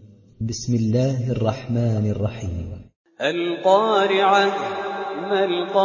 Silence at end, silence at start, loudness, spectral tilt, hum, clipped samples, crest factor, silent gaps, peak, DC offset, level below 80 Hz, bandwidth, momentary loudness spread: 0 s; 0 s; -21 LUFS; -6 dB/octave; none; under 0.1%; 16 dB; 2.96-3.05 s; -4 dBFS; under 0.1%; -44 dBFS; 7.4 kHz; 13 LU